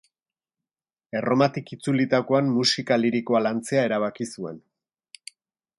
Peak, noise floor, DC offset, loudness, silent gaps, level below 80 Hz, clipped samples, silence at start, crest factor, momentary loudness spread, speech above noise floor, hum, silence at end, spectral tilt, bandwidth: -6 dBFS; under -90 dBFS; under 0.1%; -23 LUFS; none; -70 dBFS; under 0.1%; 1.15 s; 20 dB; 15 LU; over 67 dB; none; 1.2 s; -5 dB/octave; 11.5 kHz